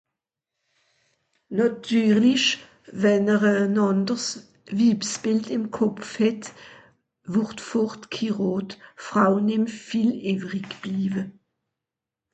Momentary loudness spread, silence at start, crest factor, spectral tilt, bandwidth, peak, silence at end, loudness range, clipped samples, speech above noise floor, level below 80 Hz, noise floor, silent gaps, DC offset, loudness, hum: 12 LU; 1.5 s; 18 dB; -5 dB/octave; 8.8 kHz; -6 dBFS; 1 s; 5 LU; under 0.1%; 64 dB; -66 dBFS; -87 dBFS; none; under 0.1%; -23 LUFS; none